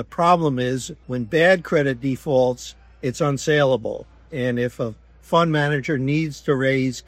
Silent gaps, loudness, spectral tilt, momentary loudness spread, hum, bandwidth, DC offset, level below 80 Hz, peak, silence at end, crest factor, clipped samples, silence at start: none; -21 LUFS; -6 dB/octave; 12 LU; none; 14.5 kHz; under 0.1%; -50 dBFS; -2 dBFS; 0.1 s; 18 dB; under 0.1%; 0 s